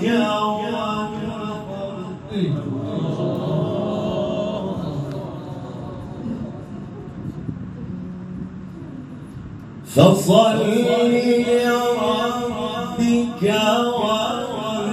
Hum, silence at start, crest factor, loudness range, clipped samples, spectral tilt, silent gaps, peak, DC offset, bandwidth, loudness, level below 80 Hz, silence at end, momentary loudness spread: none; 0 s; 20 dB; 14 LU; under 0.1%; -6 dB/octave; none; 0 dBFS; under 0.1%; 14 kHz; -21 LUFS; -50 dBFS; 0 s; 17 LU